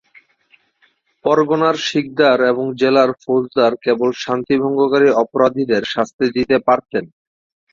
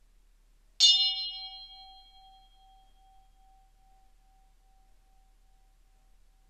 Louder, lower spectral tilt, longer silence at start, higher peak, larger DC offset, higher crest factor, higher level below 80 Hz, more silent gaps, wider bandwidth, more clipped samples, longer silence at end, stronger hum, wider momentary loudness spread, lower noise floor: first, -16 LUFS vs -23 LUFS; first, -5.5 dB/octave vs 4 dB/octave; first, 1.25 s vs 0.8 s; first, -2 dBFS vs -8 dBFS; neither; second, 16 dB vs 26 dB; about the same, -58 dBFS vs -62 dBFS; first, 6.13-6.19 s vs none; second, 7.4 kHz vs 14 kHz; neither; second, 0.65 s vs 4.65 s; neither; second, 6 LU vs 27 LU; about the same, -60 dBFS vs -62 dBFS